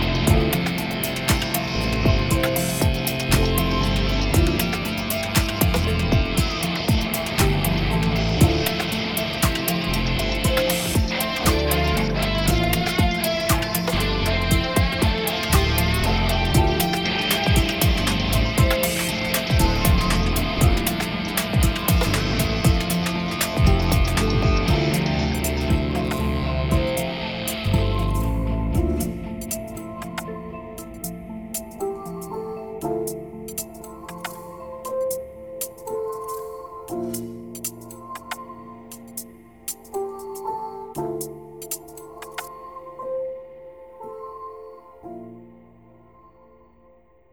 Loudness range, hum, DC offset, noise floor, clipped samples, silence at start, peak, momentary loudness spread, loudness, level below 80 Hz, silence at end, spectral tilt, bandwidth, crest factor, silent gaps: 13 LU; none; under 0.1%; -55 dBFS; under 0.1%; 0 s; -4 dBFS; 16 LU; -22 LUFS; -28 dBFS; 1.8 s; -4.5 dB/octave; over 20 kHz; 18 dB; none